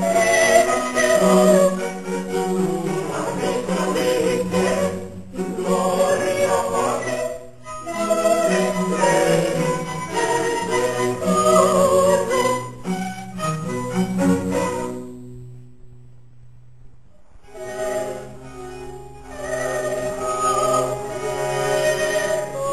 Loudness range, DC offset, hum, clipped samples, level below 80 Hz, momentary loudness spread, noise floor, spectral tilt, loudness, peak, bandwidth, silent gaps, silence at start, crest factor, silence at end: 13 LU; 0.7%; none; under 0.1%; -50 dBFS; 18 LU; -49 dBFS; -4.5 dB/octave; -20 LUFS; -2 dBFS; 16 kHz; none; 0 s; 20 dB; 0 s